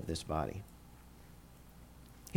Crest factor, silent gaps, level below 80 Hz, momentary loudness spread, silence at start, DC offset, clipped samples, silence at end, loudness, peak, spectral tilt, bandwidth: 24 dB; none; -54 dBFS; 20 LU; 0 s; under 0.1%; under 0.1%; 0 s; -40 LUFS; -18 dBFS; -5.5 dB/octave; 19 kHz